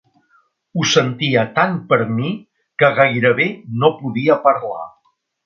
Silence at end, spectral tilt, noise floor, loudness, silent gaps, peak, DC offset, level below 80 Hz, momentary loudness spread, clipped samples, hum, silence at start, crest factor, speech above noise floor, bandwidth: 0.55 s; -5 dB/octave; -63 dBFS; -16 LUFS; none; 0 dBFS; under 0.1%; -60 dBFS; 14 LU; under 0.1%; none; 0.75 s; 18 dB; 47 dB; 7.2 kHz